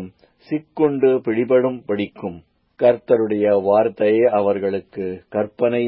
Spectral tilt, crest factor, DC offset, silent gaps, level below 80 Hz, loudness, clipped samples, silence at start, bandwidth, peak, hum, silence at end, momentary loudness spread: -12 dB/octave; 14 dB; under 0.1%; none; -58 dBFS; -19 LUFS; under 0.1%; 0 s; 5.4 kHz; -4 dBFS; none; 0 s; 12 LU